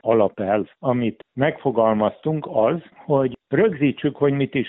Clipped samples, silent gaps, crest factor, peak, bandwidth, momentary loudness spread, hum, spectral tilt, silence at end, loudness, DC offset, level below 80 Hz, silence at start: under 0.1%; none; 16 dB; -4 dBFS; 4 kHz; 5 LU; none; -6.5 dB/octave; 0 s; -21 LUFS; under 0.1%; -62 dBFS; 0.05 s